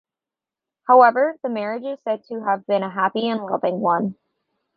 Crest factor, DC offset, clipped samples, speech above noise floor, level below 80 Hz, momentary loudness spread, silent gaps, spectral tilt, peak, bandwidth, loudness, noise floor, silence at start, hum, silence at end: 20 dB; under 0.1%; under 0.1%; 69 dB; -72 dBFS; 13 LU; none; -8.5 dB/octave; -2 dBFS; 5.2 kHz; -20 LUFS; -89 dBFS; 0.9 s; none; 0.65 s